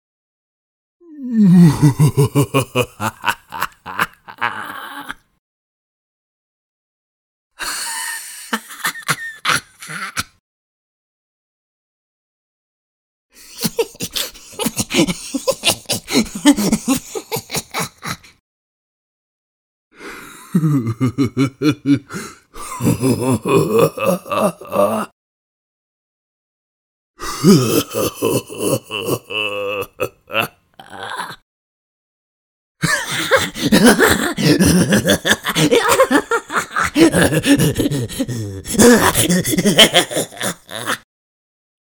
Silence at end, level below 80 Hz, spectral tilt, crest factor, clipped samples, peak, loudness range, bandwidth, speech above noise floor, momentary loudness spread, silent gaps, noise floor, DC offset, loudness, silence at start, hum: 1 s; -44 dBFS; -4.5 dB/octave; 18 dB; under 0.1%; 0 dBFS; 13 LU; 19.5 kHz; 25 dB; 16 LU; 5.39-7.51 s, 10.40-13.29 s, 18.40-19.91 s, 25.12-27.14 s, 31.42-32.75 s; -40 dBFS; under 0.1%; -16 LUFS; 1.1 s; none